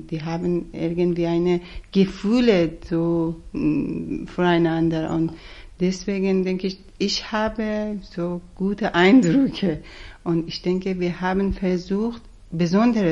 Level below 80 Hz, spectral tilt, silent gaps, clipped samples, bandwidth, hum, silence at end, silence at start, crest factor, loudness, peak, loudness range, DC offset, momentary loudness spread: -42 dBFS; -6.5 dB/octave; none; under 0.1%; 8 kHz; none; 0 s; 0 s; 16 dB; -22 LUFS; -4 dBFS; 4 LU; under 0.1%; 10 LU